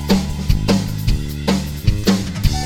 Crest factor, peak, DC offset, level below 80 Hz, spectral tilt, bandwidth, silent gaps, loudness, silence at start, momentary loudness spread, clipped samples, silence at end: 16 dB; 0 dBFS; 0.6%; -22 dBFS; -5.5 dB/octave; 17.5 kHz; none; -19 LUFS; 0 s; 4 LU; under 0.1%; 0 s